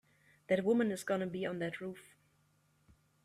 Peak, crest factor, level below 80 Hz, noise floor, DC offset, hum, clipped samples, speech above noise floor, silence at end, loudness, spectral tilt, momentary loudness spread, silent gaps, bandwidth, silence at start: -18 dBFS; 18 dB; -76 dBFS; -73 dBFS; under 0.1%; none; under 0.1%; 38 dB; 1.25 s; -36 LUFS; -6 dB/octave; 14 LU; none; 15 kHz; 0.5 s